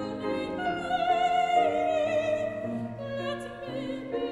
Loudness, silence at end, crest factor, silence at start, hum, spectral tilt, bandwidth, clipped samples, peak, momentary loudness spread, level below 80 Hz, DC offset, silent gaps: -29 LUFS; 0 s; 16 dB; 0 s; none; -5.5 dB/octave; 11 kHz; under 0.1%; -12 dBFS; 10 LU; -58 dBFS; under 0.1%; none